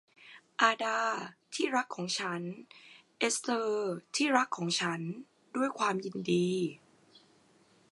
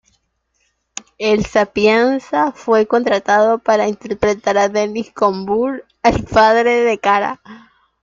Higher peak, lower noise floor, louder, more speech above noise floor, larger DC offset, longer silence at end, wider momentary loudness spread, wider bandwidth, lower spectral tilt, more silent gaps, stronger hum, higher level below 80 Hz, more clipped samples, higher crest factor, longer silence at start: second, -8 dBFS vs 0 dBFS; about the same, -65 dBFS vs -66 dBFS; second, -32 LUFS vs -15 LUFS; second, 33 dB vs 51 dB; neither; first, 1.15 s vs 0.45 s; first, 13 LU vs 9 LU; first, 11.5 kHz vs 7.6 kHz; second, -3.5 dB/octave vs -5 dB/octave; neither; neither; second, -84 dBFS vs -44 dBFS; neither; first, 24 dB vs 16 dB; second, 0.25 s vs 1.2 s